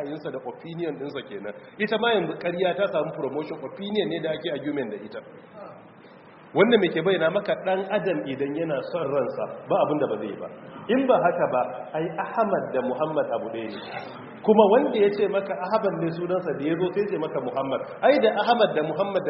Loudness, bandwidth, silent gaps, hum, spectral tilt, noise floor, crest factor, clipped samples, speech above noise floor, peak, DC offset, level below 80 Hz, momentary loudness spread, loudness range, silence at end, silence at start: -25 LUFS; 5.8 kHz; none; none; -4 dB/octave; -48 dBFS; 22 dB; under 0.1%; 24 dB; -4 dBFS; under 0.1%; -68 dBFS; 15 LU; 4 LU; 0 s; 0 s